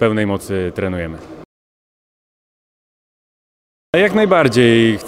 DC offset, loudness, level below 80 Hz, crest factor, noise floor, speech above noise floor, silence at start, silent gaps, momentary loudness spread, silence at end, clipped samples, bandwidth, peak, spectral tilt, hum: under 0.1%; -15 LUFS; -50 dBFS; 18 dB; under -90 dBFS; over 76 dB; 0 s; 1.45-3.93 s; 13 LU; 0 s; under 0.1%; 15.5 kHz; 0 dBFS; -6 dB/octave; none